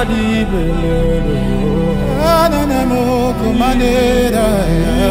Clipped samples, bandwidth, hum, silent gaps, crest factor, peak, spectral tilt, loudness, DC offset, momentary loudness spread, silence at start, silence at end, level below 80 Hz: under 0.1%; 16 kHz; none; none; 12 dB; 0 dBFS; -6.5 dB/octave; -14 LUFS; under 0.1%; 4 LU; 0 s; 0 s; -20 dBFS